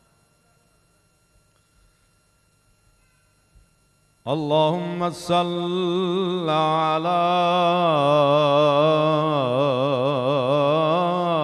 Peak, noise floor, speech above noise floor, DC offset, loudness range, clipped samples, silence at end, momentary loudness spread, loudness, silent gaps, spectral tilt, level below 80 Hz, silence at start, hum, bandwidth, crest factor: -6 dBFS; -63 dBFS; 43 dB; under 0.1%; 9 LU; under 0.1%; 0 s; 7 LU; -20 LUFS; none; -6.5 dB/octave; -64 dBFS; 4.25 s; none; 12 kHz; 16 dB